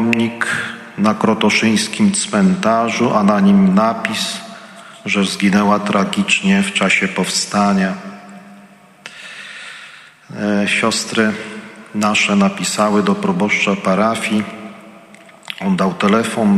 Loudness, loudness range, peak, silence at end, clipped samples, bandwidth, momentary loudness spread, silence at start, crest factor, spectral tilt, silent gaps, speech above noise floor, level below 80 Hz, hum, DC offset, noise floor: -15 LUFS; 6 LU; 0 dBFS; 0 s; under 0.1%; 13 kHz; 18 LU; 0 s; 16 dB; -4.5 dB/octave; none; 29 dB; -58 dBFS; none; under 0.1%; -43 dBFS